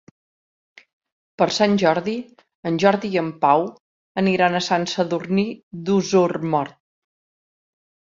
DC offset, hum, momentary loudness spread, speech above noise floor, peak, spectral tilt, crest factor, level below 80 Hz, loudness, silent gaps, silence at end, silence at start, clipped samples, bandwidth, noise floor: under 0.1%; none; 12 LU; over 70 dB; -2 dBFS; -5.5 dB/octave; 20 dB; -64 dBFS; -20 LUFS; 2.55-2.63 s, 3.80-4.15 s, 5.63-5.71 s; 1.4 s; 1.4 s; under 0.1%; 7.6 kHz; under -90 dBFS